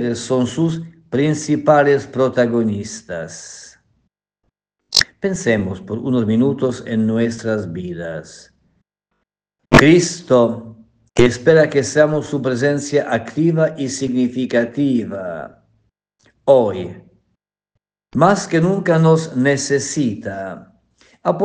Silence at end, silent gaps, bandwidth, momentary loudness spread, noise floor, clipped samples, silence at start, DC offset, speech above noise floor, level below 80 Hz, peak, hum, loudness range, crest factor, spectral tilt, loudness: 0 s; none; 10.5 kHz; 15 LU; -75 dBFS; under 0.1%; 0 s; under 0.1%; 58 dB; -44 dBFS; 0 dBFS; none; 6 LU; 18 dB; -5.5 dB/octave; -17 LUFS